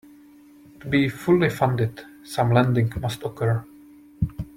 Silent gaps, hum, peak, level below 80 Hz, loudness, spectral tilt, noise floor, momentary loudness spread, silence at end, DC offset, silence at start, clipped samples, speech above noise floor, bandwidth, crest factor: none; none; -6 dBFS; -46 dBFS; -23 LUFS; -7 dB/octave; -49 dBFS; 10 LU; 0.1 s; under 0.1%; 0.8 s; under 0.1%; 28 dB; 16 kHz; 18 dB